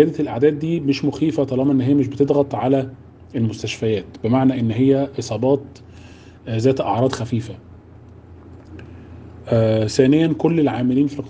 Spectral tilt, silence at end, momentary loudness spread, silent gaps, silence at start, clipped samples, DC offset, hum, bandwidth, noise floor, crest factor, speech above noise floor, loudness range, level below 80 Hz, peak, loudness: -7.5 dB/octave; 0 s; 21 LU; none; 0 s; under 0.1%; under 0.1%; none; 9.2 kHz; -42 dBFS; 18 dB; 24 dB; 5 LU; -54 dBFS; 0 dBFS; -19 LUFS